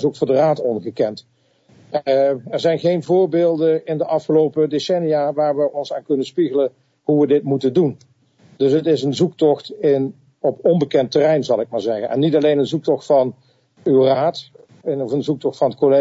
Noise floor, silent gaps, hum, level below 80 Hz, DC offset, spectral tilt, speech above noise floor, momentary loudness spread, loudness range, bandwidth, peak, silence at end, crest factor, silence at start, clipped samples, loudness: -52 dBFS; none; none; -68 dBFS; under 0.1%; -7 dB/octave; 35 dB; 7 LU; 2 LU; 8 kHz; -4 dBFS; 0 s; 14 dB; 0 s; under 0.1%; -18 LUFS